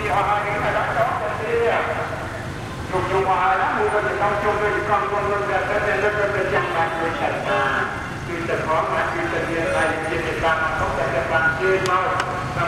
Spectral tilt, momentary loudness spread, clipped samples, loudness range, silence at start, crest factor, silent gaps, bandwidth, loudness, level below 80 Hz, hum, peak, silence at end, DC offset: -5.5 dB/octave; 6 LU; under 0.1%; 2 LU; 0 s; 16 dB; none; 15.5 kHz; -21 LUFS; -42 dBFS; none; -6 dBFS; 0 s; under 0.1%